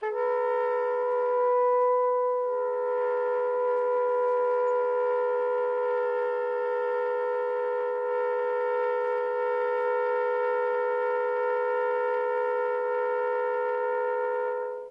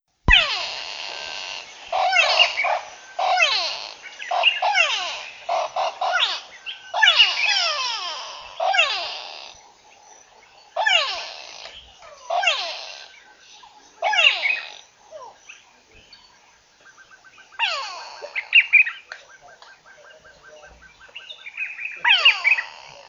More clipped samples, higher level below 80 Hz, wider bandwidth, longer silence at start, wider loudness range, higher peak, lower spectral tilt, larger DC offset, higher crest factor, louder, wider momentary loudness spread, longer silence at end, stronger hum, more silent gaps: neither; second, -78 dBFS vs -42 dBFS; second, 5 kHz vs 7.8 kHz; second, 0 s vs 0.25 s; second, 2 LU vs 7 LU; second, -16 dBFS vs 0 dBFS; first, -4 dB/octave vs -0.5 dB/octave; neither; second, 10 dB vs 22 dB; second, -27 LUFS vs -19 LUFS; second, 3 LU vs 22 LU; about the same, 0 s vs 0.05 s; neither; neither